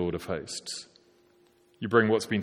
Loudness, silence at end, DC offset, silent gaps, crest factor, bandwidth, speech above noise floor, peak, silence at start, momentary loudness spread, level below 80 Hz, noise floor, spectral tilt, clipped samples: -29 LUFS; 0 s; under 0.1%; none; 22 dB; 14.5 kHz; 35 dB; -8 dBFS; 0 s; 15 LU; -60 dBFS; -63 dBFS; -5 dB/octave; under 0.1%